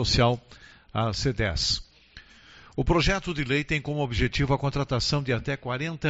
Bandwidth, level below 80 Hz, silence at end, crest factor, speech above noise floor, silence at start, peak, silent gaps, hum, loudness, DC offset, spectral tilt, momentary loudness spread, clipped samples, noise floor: 8 kHz; -38 dBFS; 0 s; 18 dB; 26 dB; 0 s; -8 dBFS; none; none; -26 LUFS; under 0.1%; -4 dB/octave; 7 LU; under 0.1%; -51 dBFS